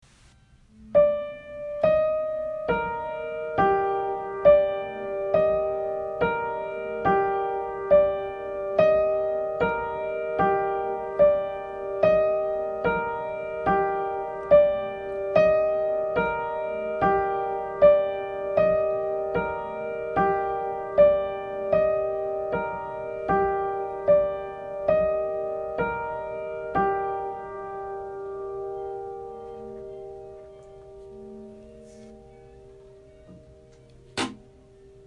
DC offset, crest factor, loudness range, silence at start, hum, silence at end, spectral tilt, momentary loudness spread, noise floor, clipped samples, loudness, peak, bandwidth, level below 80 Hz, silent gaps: under 0.1%; 20 dB; 13 LU; 0.8 s; none; 0.7 s; -6.5 dB/octave; 15 LU; -56 dBFS; under 0.1%; -25 LUFS; -6 dBFS; 9.6 kHz; -52 dBFS; none